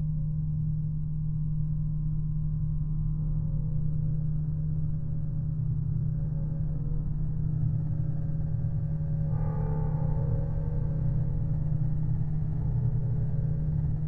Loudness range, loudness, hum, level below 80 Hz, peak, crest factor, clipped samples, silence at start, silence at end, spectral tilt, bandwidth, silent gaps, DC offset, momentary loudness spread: 1 LU; -31 LUFS; none; -34 dBFS; -16 dBFS; 12 dB; under 0.1%; 0 s; 0 s; -13 dB/octave; 2 kHz; none; under 0.1%; 3 LU